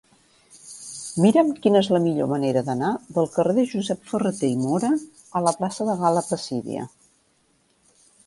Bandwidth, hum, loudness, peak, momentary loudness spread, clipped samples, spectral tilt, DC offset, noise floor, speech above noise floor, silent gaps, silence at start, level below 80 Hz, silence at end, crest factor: 11.5 kHz; none; -23 LUFS; -4 dBFS; 13 LU; under 0.1%; -6 dB/octave; under 0.1%; -64 dBFS; 43 dB; none; 0.65 s; -66 dBFS; 1.4 s; 18 dB